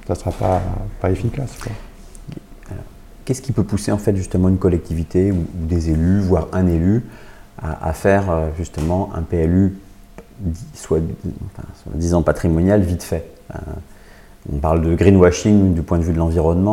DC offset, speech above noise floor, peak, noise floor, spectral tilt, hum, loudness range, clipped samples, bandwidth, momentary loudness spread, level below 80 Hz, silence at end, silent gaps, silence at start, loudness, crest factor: under 0.1%; 24 dB; 0 dBFS; -41 dBFS; -7.5 dB/octave; none; 7 LU; under 0.1%; 14.5 kHz; 20 LU; -34 dBFS; 0 s; none; 0 s; -18 LUFS; 18 dB